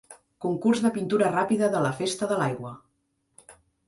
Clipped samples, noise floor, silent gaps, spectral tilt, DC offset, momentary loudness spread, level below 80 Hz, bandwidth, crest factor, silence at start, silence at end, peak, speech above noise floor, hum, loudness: under 0.1%; -74 dBFS; none; -5.5 dB/octave; under 0.1%; 9 LU; -66 dBFS; 11.5 kHz; 16 dB; 0.1 s; 0.35 s; -10 dBFS; 49 dB; none; -25 LUFS